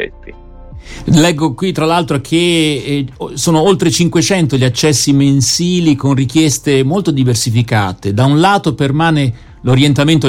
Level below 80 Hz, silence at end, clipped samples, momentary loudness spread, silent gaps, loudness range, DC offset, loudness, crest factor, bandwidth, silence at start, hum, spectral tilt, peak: -38 dBFS; 0 s; under 0.1%; 7 LU; none; 2 LU; under 0.1%; -12 LUFS; 12 dB; 16.5 kHz; 0 s; none; -5 dB/octave; 0 dBFS